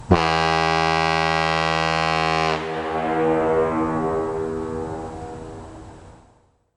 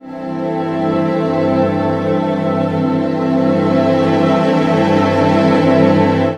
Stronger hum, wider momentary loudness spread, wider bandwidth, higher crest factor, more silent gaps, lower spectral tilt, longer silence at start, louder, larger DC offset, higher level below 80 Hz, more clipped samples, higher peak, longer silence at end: neither; first, 16 LU vs 5 LU; about the same, 10.5 kHz vs 9.8 kHz; about the same, 18 dB vs 14 dB; neither; second, -5 dB/octave vs -8 dB/octave; about the same, 0 s vs 0.05 s; second, -21 LUFS vs -14 LUFS; neither; first, -44 dBFS vs -50 dBFS; neither; second, -4 dBFS vs 0 dBFS; first, 0.65 s vs 0 s